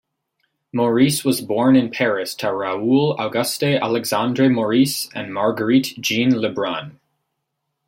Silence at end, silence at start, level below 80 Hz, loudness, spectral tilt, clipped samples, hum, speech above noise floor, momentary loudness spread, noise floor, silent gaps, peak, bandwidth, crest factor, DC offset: 0.95 s; 0.75 s; -64 dBFS; -19 LUFS; -5 dB/octave; under 0.1%; none; 58 dB; 7 LU; -76 dBFS; none; -4 dBFS; 16.5 kHz; 16 dB; under 0.1%